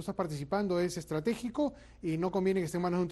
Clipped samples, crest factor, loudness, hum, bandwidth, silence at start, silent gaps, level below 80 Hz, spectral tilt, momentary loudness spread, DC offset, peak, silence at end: under 0.1%; 14 dB; -33 LUFS; none; 12.5 kHz; 0 s; none; -58 dBFS; -6.5 dB/octave; 5 LU; under 0.1%; -18 dBFS; 0 s